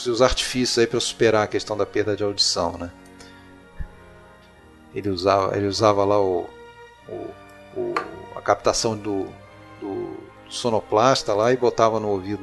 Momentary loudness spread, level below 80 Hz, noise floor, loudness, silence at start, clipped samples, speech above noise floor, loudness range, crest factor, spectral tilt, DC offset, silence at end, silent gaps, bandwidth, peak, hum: 18 LU; -44 dBFS; -49 dBFS; -21 LUFS; 0 s; under 0.1%; 28 dB; 5 LU; 22 dB; -4 dB/octave; under 0.1%; 0 s; none; 12 kHz; -2 dBFS; none